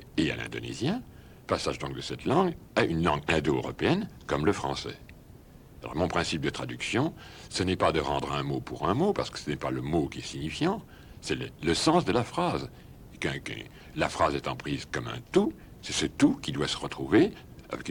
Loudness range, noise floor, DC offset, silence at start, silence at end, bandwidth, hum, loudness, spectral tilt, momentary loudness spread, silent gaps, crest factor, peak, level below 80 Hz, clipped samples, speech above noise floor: 3 LU; -51 dBFS; under 0.1%; 0 s; 0 s; 18 kHz; none; -29 LUFS; -5 dB/octave; 11 LU; none; 20 dB; -10 dBFS; -50 dBFS; under 0.1%; 22 dB